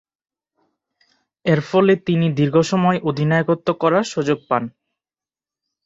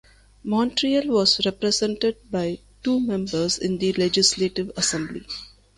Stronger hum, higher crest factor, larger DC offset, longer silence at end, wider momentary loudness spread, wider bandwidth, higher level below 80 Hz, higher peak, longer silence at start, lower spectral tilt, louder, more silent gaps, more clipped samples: neither; about the same, 18 dB vs 20 dB; neither; first, 1.15 s vs 0.3 s; second, 6 LU vs 11 LU; second, 7.8 kHz vs 11.5 kHz; second, -58 dBFS vs -52 dBFS; about the same, -2 dBFS vs -4 dBFS; first, 1.45 s vs 0.45 s; first, -7 dB/octave vs -3.5 dB/octave; first, -18 LUFS vs -22 LUFS; neither; neither